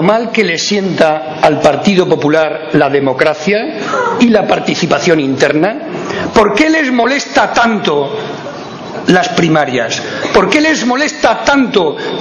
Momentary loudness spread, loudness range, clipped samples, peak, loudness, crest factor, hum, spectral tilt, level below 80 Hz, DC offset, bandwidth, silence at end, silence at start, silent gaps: 7 LU; 1 LU; 0.7%; 0 dBFS; -11 LUFS; 12 dB; none; -4.5 dB/octave; -44 dBFS; under 0.1%; 11 kHz; 0 s; 0 s; none